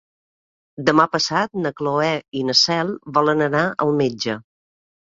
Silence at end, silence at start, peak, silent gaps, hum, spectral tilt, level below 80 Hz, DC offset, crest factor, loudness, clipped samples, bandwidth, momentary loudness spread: 0.65 s; 0.8 s; -2 dBFS; 2.28-2.32 s; none; -4 dB/octave; -60 dBFS; under 0.1%; 20 dB; -19 LUFS; under 0.1%; 7.8 kHz; 8 LU